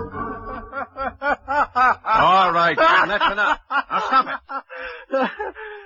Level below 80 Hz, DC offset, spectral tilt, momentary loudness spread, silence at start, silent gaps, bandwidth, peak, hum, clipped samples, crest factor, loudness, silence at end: -48 dBFS; under 0.1%; -4.5 dB/octave; 16 LU; 0 s; none; 7.4 kHz; -4 dBFS; none; under 0.1%; 16 dB; -19 LUFS; 0 s